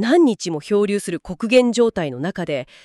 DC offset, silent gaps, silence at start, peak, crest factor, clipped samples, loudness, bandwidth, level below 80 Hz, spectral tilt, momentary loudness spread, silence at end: under 0.1%; none; 0 s; -2 dBFS; 16 dB; under 0.1%; -19 LUFS; 12.5 kHz; -54 dBFS; -5 dB/octave; 10 LU; 0.2 s